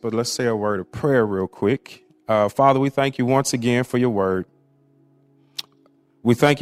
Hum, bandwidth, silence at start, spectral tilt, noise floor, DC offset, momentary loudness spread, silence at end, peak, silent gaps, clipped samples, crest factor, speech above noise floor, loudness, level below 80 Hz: none; 15.5 kHz; 0.05 s; -5.5 dB/octave; -58 dBFS; under 0.1%; 16 LU; 0 s; -2 dBFS; none; under 0.1%; 20 dB; 39 dB; -21 LUFS; -58 dBFS